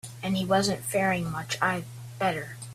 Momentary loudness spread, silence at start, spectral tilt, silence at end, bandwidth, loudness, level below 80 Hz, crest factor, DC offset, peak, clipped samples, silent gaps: 8 LU; 0.05 s; -4.5 dB/octave; 0 s; 15.5 kHz; -28 LUFS; -60 dBFS; 18 dB; under 0.1%; -10 dBFS; under 0.1%; none